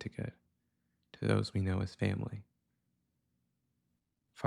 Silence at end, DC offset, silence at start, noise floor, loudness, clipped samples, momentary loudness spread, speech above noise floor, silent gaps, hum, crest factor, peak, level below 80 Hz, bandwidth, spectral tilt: 0 s; under 0.1%; 0 s; -82 dBFS; -36 LUFS; under 0.1%; 12 LU; 48 dB; none; none; 24 dB; -16 dBFS; -64 dBFS; 11 kHz; -7 dB/octave